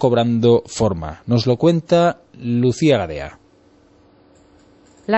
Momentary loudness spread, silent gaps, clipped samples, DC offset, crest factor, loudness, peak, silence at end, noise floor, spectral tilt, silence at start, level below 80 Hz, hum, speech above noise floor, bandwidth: 14 LU; none; under 0.1%; under 0.1%; 16 dB; -17 LUFS; -2 dBFS; 0 s; -52 dBFS; -6.5 dB/octave; 0 s; -46 dBFS; none; 35 dB; 8.4 kHz